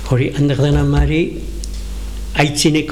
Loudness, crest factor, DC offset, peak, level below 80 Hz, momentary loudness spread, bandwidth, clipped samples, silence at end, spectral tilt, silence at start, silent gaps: -16 LUFS; 16 dB; 1%; 0 dBFS; -24 dBFS; 14 LU; 14.5 kHz; under 0.1%; 0 s; -5.5 dB/octave; 0 s; none